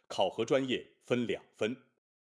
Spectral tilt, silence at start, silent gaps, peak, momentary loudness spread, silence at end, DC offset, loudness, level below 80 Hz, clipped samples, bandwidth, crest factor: -5 dB/octave; 0.1 s; none; -16 dBFS; 7 LU; 0.5 s; under 0.1%; -34 LUFS; -76 dBFS; under 0.1%; 11 kHz; 18 dB